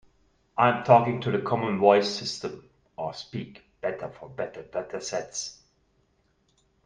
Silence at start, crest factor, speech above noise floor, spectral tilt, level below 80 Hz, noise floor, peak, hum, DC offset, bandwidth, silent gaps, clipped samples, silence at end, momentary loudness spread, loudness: 0.55 s; 24 dB; 43 dB; -5 dB/octave; -64 dBFS; -68 dBFS; -4 dBFS; none; under 0.1%; 10 kHz; none; under 0.1%; 1.3 s; 18 LU; -26 LUFS